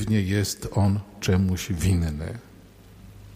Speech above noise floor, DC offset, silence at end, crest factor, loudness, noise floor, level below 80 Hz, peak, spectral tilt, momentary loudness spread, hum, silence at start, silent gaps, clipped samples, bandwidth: 25 dB; under 0.1%; 0 s; 14 dB; -25 LUFS; -49 dBFS; -42 dBFS; -10 dBFS; -6 dB/octave; 10 LU; none; 0 s; none; under 0.1%; 16 kHz